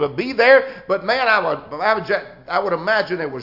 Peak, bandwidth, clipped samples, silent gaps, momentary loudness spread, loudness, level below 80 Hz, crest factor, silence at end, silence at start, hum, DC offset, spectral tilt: -2 dBFS; 5.8 kHz; under 0.1%; none; 11 LU; -18 LUFS; -58 dBFS; 18 dB; 0 s; 0 s; none; under 0.1%; -6 dB/octave